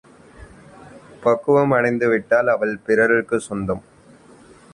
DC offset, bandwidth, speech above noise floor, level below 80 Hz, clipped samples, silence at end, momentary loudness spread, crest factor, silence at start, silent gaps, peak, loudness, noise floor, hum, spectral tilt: under 0.1%; 11.5 kHz; 30 dB; -52 dBFS; under 0.1%; 0.95 s; 9 LU; 16 dB; 0.4 s; none; -4 dBFS; -19 LUFS; -48 dBFS; none; -7 dB/octave